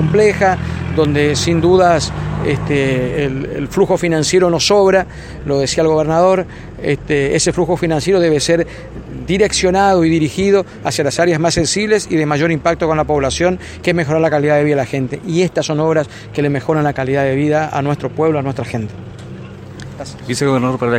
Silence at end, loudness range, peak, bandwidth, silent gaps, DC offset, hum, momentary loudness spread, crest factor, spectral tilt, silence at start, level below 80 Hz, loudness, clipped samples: 0 s; 3 LU; 0 dBFS; 16 kHz; none; under 0.1%; none; 11 LU; 14 dB; -5 dB/octave; 0 s; -36 dBFS; -15 LUFS; under 0.1%